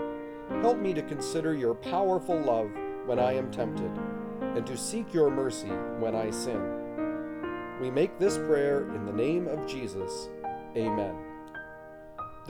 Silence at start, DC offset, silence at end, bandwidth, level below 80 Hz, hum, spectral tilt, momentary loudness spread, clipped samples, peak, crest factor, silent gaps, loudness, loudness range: 0 s; under 0.1%; 0 s; 18.5 kHz; -58 dBFS; none; -5.5 dB/octave; 11 LU; under 0.1%; -12 dBFS; 18 dB; none; -31 LUFS; 2 LU